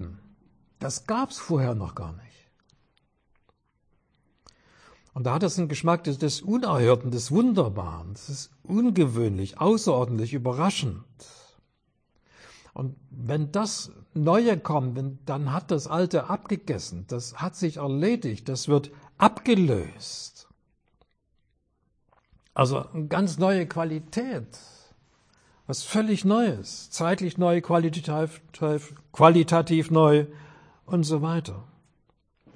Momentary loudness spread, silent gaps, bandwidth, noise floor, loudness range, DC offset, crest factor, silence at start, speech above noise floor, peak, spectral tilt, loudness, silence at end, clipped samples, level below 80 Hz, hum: 15 LU; none; 10.5 kHz; -71 dBFS; 10 LU; under 0.1%; 24 dB; 0 s; 47 dB; -2 dBFS; -6 dB/octave; -25 LUFS; 0.9 s; under 0.1%; -58 dBFS; none